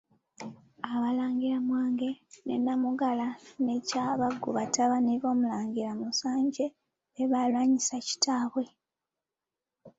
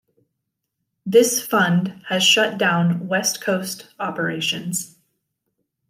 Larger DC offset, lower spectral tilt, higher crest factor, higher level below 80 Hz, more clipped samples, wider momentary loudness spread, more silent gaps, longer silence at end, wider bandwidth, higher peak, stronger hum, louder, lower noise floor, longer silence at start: neither; about the same, -3.5 dB/octave vs -3.5 dB/octave; about the same, 18 dB vs 20 dB; about the same, -74 dBFS vs -70 dBFS; neither; second, 9 LU vs 13 LU; neither; second, 0.1 s vs 1.05 s; second, 8 kHz vs 16 kHz; second, -12 dBFS vs -2 dBFS; neither; second, -29 LUFS vs -19 LUFS; first, under -90 dBFS vs -78 dBFS; second, 0.4 s vs 1.05 s